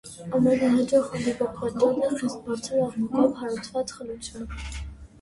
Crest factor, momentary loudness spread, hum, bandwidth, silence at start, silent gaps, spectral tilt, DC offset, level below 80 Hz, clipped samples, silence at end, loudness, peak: 16 dB; 15 LU; none; 11.5 kHz; 0.05 s; none; -6 dB/octave; under 0.1%; -46 dBFS; under 0.1%; 0.15 s; -25 LUFS; -10 dBFS